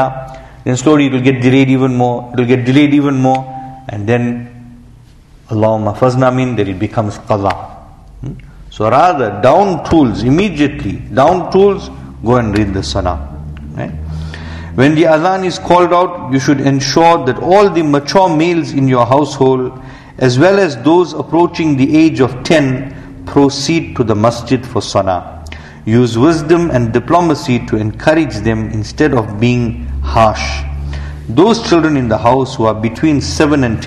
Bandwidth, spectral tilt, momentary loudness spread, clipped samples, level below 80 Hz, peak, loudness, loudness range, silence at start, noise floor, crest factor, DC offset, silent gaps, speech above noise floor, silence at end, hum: 11.5 kHz; -6.5 dB/octave; 14 LU; 0.2%; -30 dBFS; 0 dBFS; -12 LUFS; 4 LU; 0 s; -40 dBFS; 12 dB; under 0.1%; none; 29 dB; 0 s; none